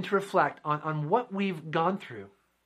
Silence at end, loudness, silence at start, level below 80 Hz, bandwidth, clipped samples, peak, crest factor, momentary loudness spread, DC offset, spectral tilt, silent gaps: 0.35 s; -29 LUFS; 0 s; -78 dBFS; 14.5 kHz; under 0.1%; -10 dBFS; 20 dB; 10 LU; under 0.1%; -7 dB/octave; none